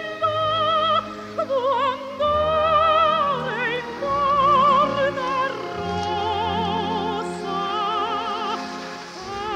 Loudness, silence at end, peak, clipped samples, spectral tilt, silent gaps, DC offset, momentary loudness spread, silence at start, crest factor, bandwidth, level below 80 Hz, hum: -21 LUFS; 0 s; -8 dBFS; under 0.1%; -5 dB/octave; none; under 0.1%; 11 LU; 0 s; 14 dB; 12.5 kHz; -50 dBFS; none